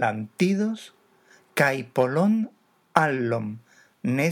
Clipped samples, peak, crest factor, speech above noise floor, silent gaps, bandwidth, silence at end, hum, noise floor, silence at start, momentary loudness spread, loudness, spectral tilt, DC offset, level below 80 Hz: under 0.1%; 0 dBFS; 24 dB; 34 dB; none; 19 kHz; 0 s; none; -58 dBFS; 0 s; 12 LU; -25 LUFS; -6.5 dB/octave; under 0.1%; -80 dBFS